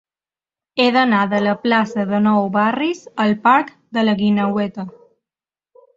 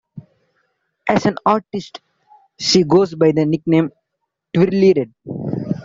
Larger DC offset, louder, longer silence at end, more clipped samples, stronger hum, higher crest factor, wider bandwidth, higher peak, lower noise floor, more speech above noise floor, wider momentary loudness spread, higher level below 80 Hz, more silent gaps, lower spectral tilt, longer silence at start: neither; about the same, -17 LUFS vs -17 LUFS; first, 1.05 s vs 0 s; neither; neither; about the same, 16 dB vs 16 dB; about the same, 7.6 kHz vs 7.8 kHz; about the same, -2 dBFS vs -2 dBFS; first, under -90 dBFS vs -76 dBFS; first, over 73 dB vs 61 dB; second, 9 LU vs 15 LU; second, -62 dBFS vs -56 dBFS; neither; about the same, -6.5 dB/octave vs -6 dB/octave; first, 0.75 s vs 0.15 s